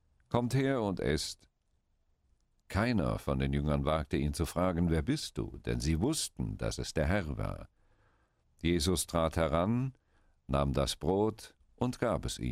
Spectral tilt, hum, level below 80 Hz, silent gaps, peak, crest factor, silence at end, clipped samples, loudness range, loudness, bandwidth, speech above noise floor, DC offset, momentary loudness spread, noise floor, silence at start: -5.5 dB/octave; none; -44 dBFS; none; -14 dBFS; 18 dB; 0 s; under 0.1%; 2 LU; -33 LUFS; 16 kHz; 43 dB; under 0.1%; 8 LU; -75 dBFS; 0.3 s